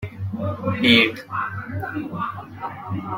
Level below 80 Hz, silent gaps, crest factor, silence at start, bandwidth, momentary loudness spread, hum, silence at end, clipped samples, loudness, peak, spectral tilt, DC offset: -58 dBFS; none; 22 dB; 0 s; 16.5 kHz; 16 LU; none; 0 s; under 0.1%; -22 LUFS; -2 dBFS; -6 dB/octave; under 0.1%